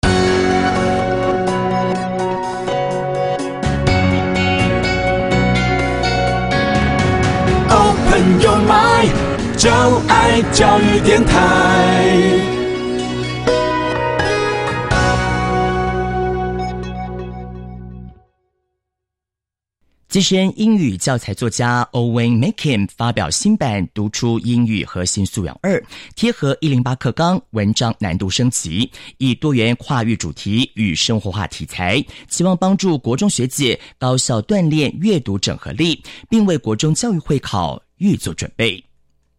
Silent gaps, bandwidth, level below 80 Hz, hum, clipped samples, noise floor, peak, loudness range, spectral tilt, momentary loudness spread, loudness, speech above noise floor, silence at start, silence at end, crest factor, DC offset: none; 15 kHz; -32 dBFS; none; under 0.1%; -86 dBFS; 0 dBFS; 7 LU; -5 dB/octave; 9 LU; -16 LUFS; 70 dB; 0.05 s; 0.6 s; 16 dB; under 0.1%